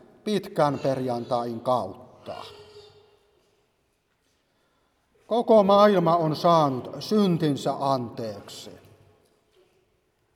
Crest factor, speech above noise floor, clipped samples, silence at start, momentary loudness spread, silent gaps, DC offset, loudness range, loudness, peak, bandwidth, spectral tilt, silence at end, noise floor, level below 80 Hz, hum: 20 dB; 48 dB; under 0.1%; 0.25 s; 22 LU; none; under 0.1%; 12 LU; -23 LUFS; -4 dBFS; 15.5 kHz; -7 dB/octave; 1.6 s; -71 dBFS; -70 dBFS; none